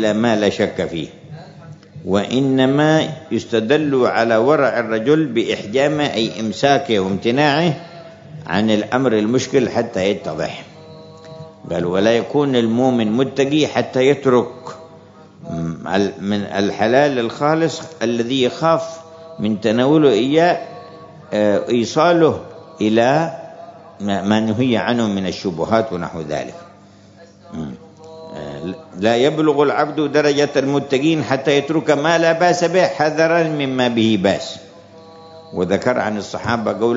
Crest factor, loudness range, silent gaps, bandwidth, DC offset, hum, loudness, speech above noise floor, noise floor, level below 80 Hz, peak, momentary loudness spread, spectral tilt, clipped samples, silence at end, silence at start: 16 dB; 4 LU; none; 7.8 kHz; under 0.1%; none; -17 LUFS; 28 dB; -44 dBFS; -58 dBFS; 0 dBFS; 16 LU; -5.5 dB/octave; under 0.1%; 0 s; 0 s